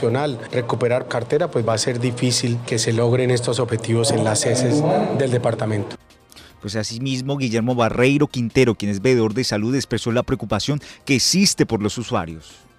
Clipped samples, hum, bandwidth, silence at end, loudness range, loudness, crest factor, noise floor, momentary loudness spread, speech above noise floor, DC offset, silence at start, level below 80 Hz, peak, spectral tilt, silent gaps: under 0.1%; none; 15.5 kHz; 0.25 s; 3 LU; -20 LUFS; 18 dB; -46 dBFS; 8 LU; 26 dB; under 0.1%; 0 s; -50 dBFS; -2 dBFS; -5 dB/octave; none